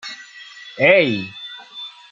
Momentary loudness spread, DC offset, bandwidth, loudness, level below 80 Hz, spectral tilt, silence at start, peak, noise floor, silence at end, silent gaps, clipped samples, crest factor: 23 LU; under 0.1%; 7.4 kHz; -15 LUFS; -66 dBFS; -5.5 dB/octave; 0.05 s; -2 dBFS; -40 dBFS; 0.2 s; none; under 0.1%; 20 dB